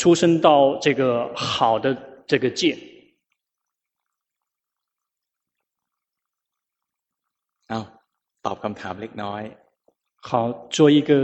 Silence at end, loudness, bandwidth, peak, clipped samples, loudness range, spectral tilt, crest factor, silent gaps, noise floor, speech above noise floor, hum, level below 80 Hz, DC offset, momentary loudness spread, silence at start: 0 s; -21 LUFS; 8.4 kHz; -2 dBFS; under 0.1%; 20 LU; -5.5 dB/octave; 20 dB; none; -85 dBFS; 66 dB; none; -64 dBFS; under 0.1%; 17 LU; 0 s